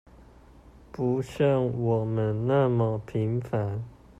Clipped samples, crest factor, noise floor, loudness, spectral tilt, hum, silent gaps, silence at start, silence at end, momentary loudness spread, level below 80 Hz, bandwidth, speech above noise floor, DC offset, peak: under 0.1%; 16 dB; -52 dBFS; -27 LUFS; -9 dB/octave; none; none; 0.95 s; 0.25 s; 7 LU; -54 dBFS; 8.4 kHz; 26 dB; under 0.1%; -12 dBFS